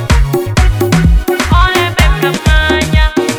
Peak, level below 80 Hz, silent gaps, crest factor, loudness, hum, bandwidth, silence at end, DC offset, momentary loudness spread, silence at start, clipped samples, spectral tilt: 0 dBFS; -12 dBFS; none; 10 dB; -11 LUFS; none; 19 kHz; 0 s; under 0.1%; 3 LU; 0 s; 0.3%; -5 dB/octave